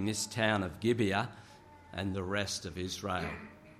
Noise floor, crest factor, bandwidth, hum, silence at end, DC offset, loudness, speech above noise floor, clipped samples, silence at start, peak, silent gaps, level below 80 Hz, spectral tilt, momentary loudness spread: -54 dBFS; 22 dB; 15 kHz; none; 0 s; under 0.1%; -34 LUFS; 20 dB; under 0.1%; 0 s; -14 dBFS; none; -60 dBFS; -4.5 dB/octave; 11 LU